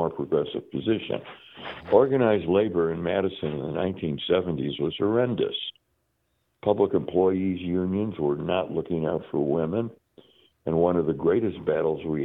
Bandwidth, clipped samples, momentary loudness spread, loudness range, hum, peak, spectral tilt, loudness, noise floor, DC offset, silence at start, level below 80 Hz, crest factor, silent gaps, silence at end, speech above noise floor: 4.1 kHz; under 0.1%; 9 LU; 3 LU; none; -4 dBFS; -10 dB/octave; -26 LUFS; -73 dBFS; under 0.1%; 0 s; -60 dBFS; 20 dB; none; 0 s; 48 dB